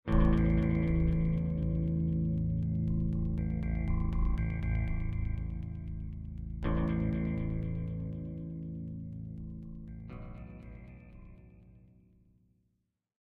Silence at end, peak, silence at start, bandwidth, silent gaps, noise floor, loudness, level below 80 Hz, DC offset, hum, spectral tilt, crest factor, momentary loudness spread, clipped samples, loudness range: 1.45 s; -16 dBFS; 0.05 s; 3.7 kHz; none; -80 dBFS; -34 LUFS; -36 dBFS; under 0.1%; none; -11 dB/octave; 18 dB; 17 LU; under 0.1%; 16 LU